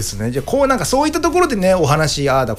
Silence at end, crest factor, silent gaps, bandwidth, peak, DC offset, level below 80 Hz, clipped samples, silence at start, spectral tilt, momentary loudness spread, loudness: 0 s; 12 dB; none; 16 kHz; -4 dBFS; under 0.1%; -34 dBFS; under 0.1%; 0 s; -5 dB/octave; 5 LU; -16 LUFS